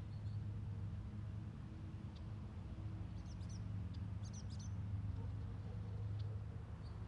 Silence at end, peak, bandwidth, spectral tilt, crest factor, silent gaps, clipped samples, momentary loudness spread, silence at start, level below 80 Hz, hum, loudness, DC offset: 0 s; -36 dBFS; 7.6 kHz; -7.5 dB/octave; 10 dB; none; under 0.1%; 5 LU; 0 s; -56 dBFS; none; -48 LUFS; under 0.1%